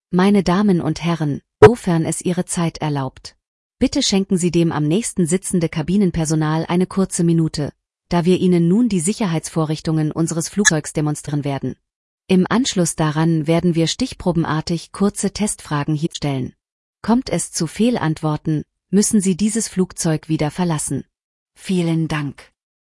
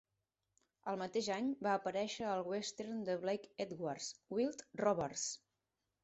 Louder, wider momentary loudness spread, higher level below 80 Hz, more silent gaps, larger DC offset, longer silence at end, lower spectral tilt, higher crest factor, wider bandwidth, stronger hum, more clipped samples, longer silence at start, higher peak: first, -18 LUFS vs -40 LUFS; about the same, 8 LU vs 7 LU; first, -44 dBFS vs -78 dBFS; first, 3.48-3.70 s, 11.95-12.18 s, 16.72-16.94 s, 21.24-21.46 s vs none; neither; second, 0.4 s vs 0.65 s; first, -5.5 dB/octave vs -4 dB/octave; about the same, 18 dB vs 20 dB; first, 12 kHz vs 8.2 kHz; neither; neither; second, 0.1 s vs 0.85 s; first, 0 dBFS vs -20 dBFS